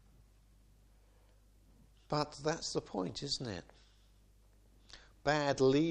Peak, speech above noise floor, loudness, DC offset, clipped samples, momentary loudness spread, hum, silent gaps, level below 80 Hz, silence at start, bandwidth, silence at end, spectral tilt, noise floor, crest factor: -16 dBFS; 31 dB; -36 LUFS; under 0.1%; under 0.1%; 21 LU; 50 Hz at -65 dBFS; none; -62 dBFS; 2.1 s; 10.5 kHz; 0 s; -5 dB/octave; -65 dBFS; 22 dB